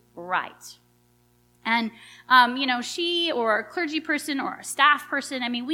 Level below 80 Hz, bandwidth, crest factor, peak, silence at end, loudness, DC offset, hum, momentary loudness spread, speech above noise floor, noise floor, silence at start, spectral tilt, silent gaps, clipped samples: -72 dBFS; 17 kHz; 22 dB; -4 dBFS; 0 s; -23 LUFS; under 0.1%; 60 Hz at -55 dBFS; 11 LU; 38 dB; -62 dBFS; 0.15 s; -2 dB/octave; none; under 0.1%